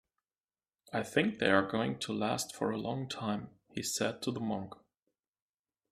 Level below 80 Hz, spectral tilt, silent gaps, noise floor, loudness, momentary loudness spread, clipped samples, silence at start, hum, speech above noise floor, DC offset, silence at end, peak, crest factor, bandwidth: -72 dBFS; -4 dB/octave; none; under -90 dBFS; -34 LUFS; 11 LU; under 0.1%; 0.9 s; none; over 56 dB; under 0.1%; 1.15 s; -12 dBFS; 24 dB; 15.5 kHz